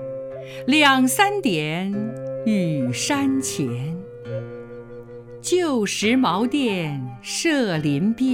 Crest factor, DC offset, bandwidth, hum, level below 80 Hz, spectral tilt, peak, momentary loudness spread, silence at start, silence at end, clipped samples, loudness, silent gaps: 20 dB; under 0.1%; 17.5 kHz; none; -58 dBFS; -4.5 dB/octave; -2 dBFS; 17 LU; 0 s; 0 s; under 0.1%; -21 LUFS; none